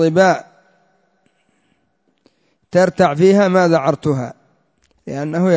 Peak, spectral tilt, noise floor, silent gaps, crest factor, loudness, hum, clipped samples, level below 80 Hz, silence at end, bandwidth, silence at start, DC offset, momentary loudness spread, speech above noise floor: -2 dBFS; -6.5 dB/octave; -64 dBFS; none; 16 dB; -15 LUFS; none; under 0.1%; -56 dBFS; 0 s; 8 kHz; 0 s; under 0.1%; 15 LU; 51 dB